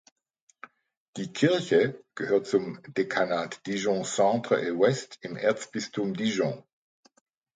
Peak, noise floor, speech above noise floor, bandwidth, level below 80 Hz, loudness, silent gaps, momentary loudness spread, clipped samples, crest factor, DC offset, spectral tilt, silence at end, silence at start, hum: -8 dBFS; -52 dBFS; 25 dB; 9.4 kHz; -72 dBFS; -27 LUFS; none; 11 LU; under 0.1%; 20 dB; under 0.1%; -5 dB/octave; 0.95 s; 1.15 s; none